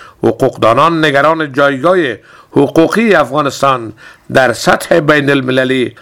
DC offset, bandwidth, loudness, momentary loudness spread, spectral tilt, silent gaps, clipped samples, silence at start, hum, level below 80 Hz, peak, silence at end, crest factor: 0.3%; 18.5 kHz; -11 LUFS; 6 LU; -5.5 dB/octave; none; 0.4%; 0 s; none; -44 dBFS; 0 dBFS; 0.1 s; 10 dB